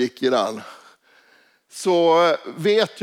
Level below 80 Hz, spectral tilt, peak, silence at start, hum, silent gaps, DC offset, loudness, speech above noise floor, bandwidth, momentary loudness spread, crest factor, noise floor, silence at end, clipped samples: -80 dBFS; -4.5 dB/octave; -6 dBFS; 0 s; none; none; under 0.1%; -19 LUFS; 38 dB; 15 kHz; 13 LU; 14 dB; -57 dBFS; 0 s; under 0.1%